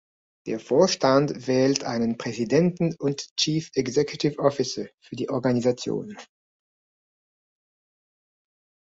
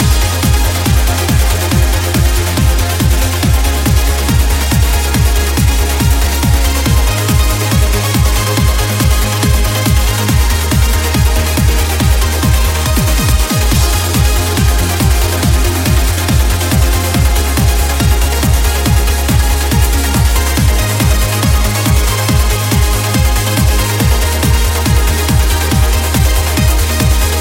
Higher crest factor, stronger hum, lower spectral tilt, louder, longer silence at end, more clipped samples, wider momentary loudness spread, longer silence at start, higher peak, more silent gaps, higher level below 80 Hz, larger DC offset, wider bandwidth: first, 22 dB vs 10 dB; neither; about the same, -5 dB/octave vs -4.5 dB/octave; second, -24 LUFS vs -12 LUFS; first, 2.6 s vs 0 s; neither; first, 12 LU vs 1 LU; first, 0.45 s vs 0 s; second, -4 dBFS vs 0 dBFS; first, 3.31-3.36 s, 4.94-4.98 s vs none; second, -64 dBFS vs -14 dBFS; neither; second, 8 kHz vs 17 kHz